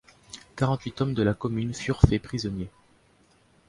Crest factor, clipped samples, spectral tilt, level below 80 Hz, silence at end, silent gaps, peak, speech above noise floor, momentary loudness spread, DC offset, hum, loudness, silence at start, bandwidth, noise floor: 26 dB; under 0.1%; -7 dB/octave; -38 dBFS; 1 s; none; 0 dBFS; 36 dB; 19 LU; under 0.1%; none; -27 LUFS; 0.35 s; 11.5 kHz; -61 dBFS